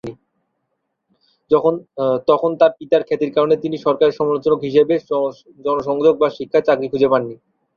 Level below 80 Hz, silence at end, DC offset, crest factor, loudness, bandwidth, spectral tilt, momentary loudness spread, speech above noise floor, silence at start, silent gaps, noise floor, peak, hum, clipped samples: -60 dBFS; 0.4 s; under 0.1%; 16 dB; -17 LUFS; 6.8 kHz; -7.5 dB/octave; 6 LU; 57 dB; 0.05 s; none; -73 dBFS; -2 dBFS; none; under 0.1%